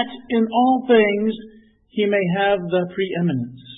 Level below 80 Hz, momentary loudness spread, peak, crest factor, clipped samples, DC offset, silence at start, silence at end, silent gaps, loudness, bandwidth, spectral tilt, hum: -60 dBFS; 10 LU; -4 dBFS; 16 dB; under 0.1%; under 0.1%; 0 s; 0 s; none; -19 LUFS; 4 kHz; -11.5 dB/octave; none